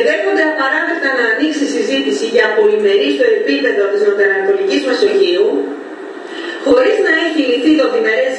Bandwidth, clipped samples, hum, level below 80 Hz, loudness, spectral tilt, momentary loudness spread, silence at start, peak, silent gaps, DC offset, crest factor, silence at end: 10.5 kHz; under 0.1%; none; -62 dBFS; -13 LUFS; -3 dB/octave; 8 LU; 0 s; 0 dBFS; none; under 0.1%; 12 dB; 0 s